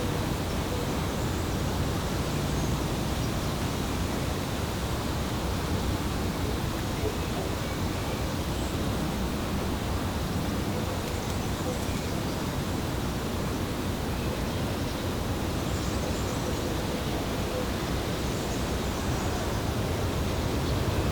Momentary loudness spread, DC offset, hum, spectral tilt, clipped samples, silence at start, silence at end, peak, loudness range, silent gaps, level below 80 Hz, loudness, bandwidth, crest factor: 2 LU; under 0.1%; none; -5 dB/octave; under 0.1%; 0 s; 0 s; -16 dBFS; 1 LU; none; -38 dBFS; -30 LUFS; over 20 kHz; 14 dB